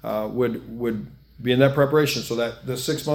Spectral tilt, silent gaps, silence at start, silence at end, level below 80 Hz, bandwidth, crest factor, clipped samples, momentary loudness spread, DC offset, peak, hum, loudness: -5.5 dB/octave; none; 0.05 s; 0 s; -52 dBFS; 17.5 kHz; 20 dB; under 0.1%; 11 LU; under 0.1%; -4 dBFS; none; -23 LUFS